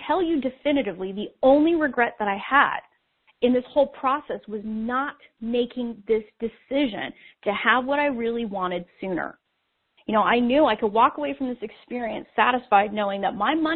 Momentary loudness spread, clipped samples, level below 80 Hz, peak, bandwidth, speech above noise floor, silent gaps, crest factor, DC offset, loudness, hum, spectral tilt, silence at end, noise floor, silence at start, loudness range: 12 LU; under 0.1%; -58 dBFS; -4 dBFS; 4.4 kHz; 51 dB; none; 20 dB; under 0.1%; -24 LUFS; none; -2.5 dB/octave; 0 s; -74 dBFS; 0 s; 5 LU